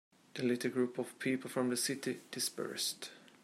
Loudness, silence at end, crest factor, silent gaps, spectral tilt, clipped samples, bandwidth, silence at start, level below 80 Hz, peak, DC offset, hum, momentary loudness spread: -37 LUFS; 0.15 s; 18 dB; none; -3 dB/octave; under 0.1%; 16 kHz; 0.35 s; -86 dBFS; -20 dBFS; under 0.1%; none; 7 LU